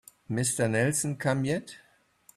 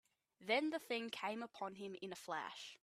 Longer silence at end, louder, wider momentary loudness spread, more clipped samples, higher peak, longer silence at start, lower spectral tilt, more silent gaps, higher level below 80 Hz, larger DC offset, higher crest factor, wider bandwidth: first, 0.6 s vs 0.05 s; first, -28 LUFS vs -43 LUFS; about the same, 9 LU vs 11 LU; neither; first, -12 dBFS vs -24 dBFS; about the same, 0.3 s vs 0.4 s; about the same, -4.5 dB/octave vs -3.5 dB/octave; neither; first, -64 dBFS vs under -90 dBFS; neither; about the same, 18 dB vs 20 dB; about the same, 15 kHz vs 15 kHz